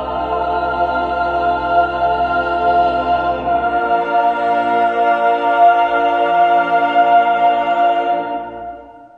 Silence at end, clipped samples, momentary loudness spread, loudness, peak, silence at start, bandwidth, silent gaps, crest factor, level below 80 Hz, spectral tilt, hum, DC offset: 0.1 s; under 0.1%; 7 LU; -15 LUFS; -2 dBFS; 0 s; 5.2 kHz; none; 14 dB; -40 dBFS; -6.5 dB/octave; none; under 0.1%